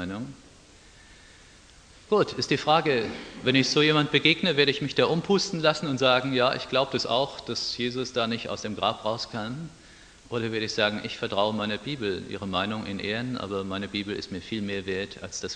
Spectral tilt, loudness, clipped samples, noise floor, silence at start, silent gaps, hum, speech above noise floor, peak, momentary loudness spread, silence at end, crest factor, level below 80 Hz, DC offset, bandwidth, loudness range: -4.5 dB/octave; -26 LUFS; under 0.1%; -52 dBFS; 0 s; none; none; 26 dB; -6 dBFS; 12 LU; 0 s; 22 dB; -58 dBFS; under 0.1%; 10 kHz; 8 LU